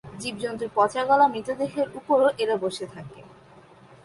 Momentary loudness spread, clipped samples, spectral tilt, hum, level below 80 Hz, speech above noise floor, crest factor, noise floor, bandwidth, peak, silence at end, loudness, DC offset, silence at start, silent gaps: 15 LU; under 0.1%; -4.5 dB/octave; none; -64 dBFS; 27 dB; 18 dB; -51 dBFS; 11.5 kHz; -8 dBFS; 0.75 s; -24 LUFS; under 0.1%; 0.05 s; none